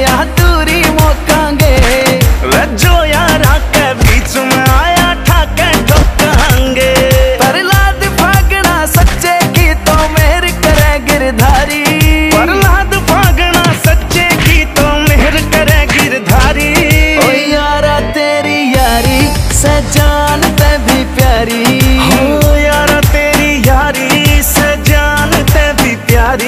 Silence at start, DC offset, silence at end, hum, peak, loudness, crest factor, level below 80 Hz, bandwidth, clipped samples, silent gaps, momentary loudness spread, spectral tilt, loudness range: 0 s; under 0.1%; 0 s; none; 0 dBFS; -8 LUFS; 8 dB; -14 dBFS; 16 kHz; 0.5%; none; 2 LU; -4.5 dB/octave; 1 LU